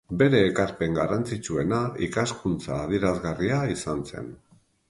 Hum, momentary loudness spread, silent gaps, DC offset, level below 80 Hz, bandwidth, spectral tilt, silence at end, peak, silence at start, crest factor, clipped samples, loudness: none; 10 LU; none; under 0.1%; -48 dBFS; 11.5 kHz; -6 dB/octave; 0.55 s; -6 dBFS; 0.1 s; 20 dB; under 0.1%; -26 LUFS